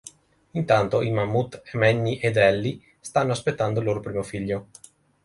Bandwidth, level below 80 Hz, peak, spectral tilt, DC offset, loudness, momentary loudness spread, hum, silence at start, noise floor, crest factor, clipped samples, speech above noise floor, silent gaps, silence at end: 11.5 kHz; -54 dBFS; -6 dBFS; -6 dB/octave; under 0.1%; -24 LUFS; 11 LU; none; 0.05 s; -49 dBFS; 20 dB; under 0.1%; 26 dB; none; 0.6 s